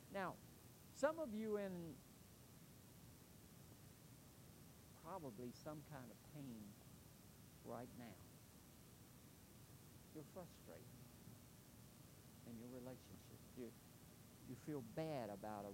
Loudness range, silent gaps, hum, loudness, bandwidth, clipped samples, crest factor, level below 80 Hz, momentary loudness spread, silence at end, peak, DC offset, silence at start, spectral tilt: 11 LU; none; none; -55 LUFS; 16 kHz; under 0.1%; 26 dB; -76 dBFS; 16 LU; 0 s; -28 dBFS; under 0.1%; 0 s; -5.5 dB/octave